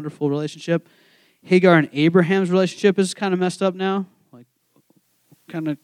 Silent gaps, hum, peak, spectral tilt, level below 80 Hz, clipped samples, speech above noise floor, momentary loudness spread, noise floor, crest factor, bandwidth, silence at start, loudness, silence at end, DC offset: none; none; -2 dBFS; -6.5 dB/octave; -78 dBFS; under 0.1%; 43 dB; 12 LU; -62 dBFS; 20 dB; 11.5 kHz; 0 s; -19 LUFS; 0.1 s; under 0.1%